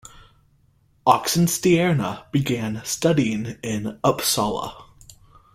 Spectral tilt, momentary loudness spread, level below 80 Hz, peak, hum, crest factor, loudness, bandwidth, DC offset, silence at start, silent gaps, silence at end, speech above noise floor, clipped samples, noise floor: -4.5 dB/octave; 10 LU; -52 dBFS; -2 dBFS; none; 22 dB; -21 LUFS; 16.5 kHz; under 0.1%; 0.15 s; none; 0.7 s; 39 dB; under 0.1%; -60 dBFS